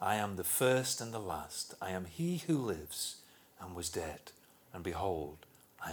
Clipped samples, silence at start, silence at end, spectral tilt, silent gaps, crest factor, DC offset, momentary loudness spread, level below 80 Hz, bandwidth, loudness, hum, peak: under 0.1%; 0 s; 0 s; -4 dB/octave; none; 20 dB; under 0.1%; 20 LU; -62 dBFS; over 20 kHz; -37 LUFS; none; -18 dBFS